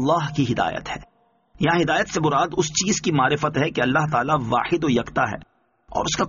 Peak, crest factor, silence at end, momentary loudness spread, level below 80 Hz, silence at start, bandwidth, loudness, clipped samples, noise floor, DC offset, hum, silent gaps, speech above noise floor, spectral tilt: -6 dBFS; 16 dB; 0 s; 7 LU; -48 dBFS; 0 s; 7.4 kHz; -21 LUFS; under 0.1%; -56 dBFS; under 0.1%; none; none; 35 dB; -4 dB/octave